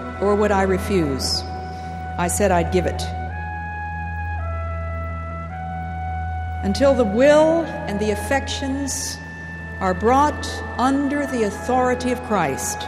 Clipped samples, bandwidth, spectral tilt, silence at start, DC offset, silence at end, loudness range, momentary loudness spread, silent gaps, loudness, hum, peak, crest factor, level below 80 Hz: under 0.1%; 15.5 kHz; -5 dB/octave; 0 s; under 0.1%; 0 s; 8 LU; 12 LU; none; -21 LUFS; none; -4 dBFS; 18 dB; -34 dBFS